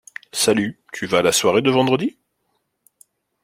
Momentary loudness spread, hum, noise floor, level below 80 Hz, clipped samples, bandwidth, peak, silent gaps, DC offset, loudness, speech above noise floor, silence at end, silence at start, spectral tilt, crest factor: 12 LU; none; -71 dBFS; -60 dBFS; under 0.1%; 16.5 kHz; -2 dBFS; none; under 0.1%; -19 LUFS; 53 dB; 1.35 s; 0.35 s; -3.5 dB/octave; 18 dB